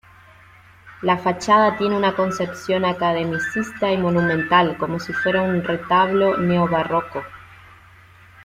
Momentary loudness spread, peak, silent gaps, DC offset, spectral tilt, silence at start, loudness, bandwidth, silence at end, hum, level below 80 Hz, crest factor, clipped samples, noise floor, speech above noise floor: 8 LU; -4 dBFS; none; under 0.1%; -6 dB/octave; 0.85 s; -19 LUFS; 14 kHz; 0 s; none; -54 dBFS; 16 dB; under 0.1%; -48 dBFS; 29 dB